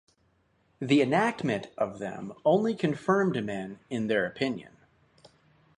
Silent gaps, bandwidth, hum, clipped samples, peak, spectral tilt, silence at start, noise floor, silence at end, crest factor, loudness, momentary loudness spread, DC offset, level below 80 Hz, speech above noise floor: none; 10.5 kHz; none; under 0.1%; -10 dBFS; -6.5 dB/octave; 0.8 s; -69 dBFS; 1.1 s; 20 dB; -28 LUFS; 12 LU; under 0.1%; -68 dBFS; 41 dB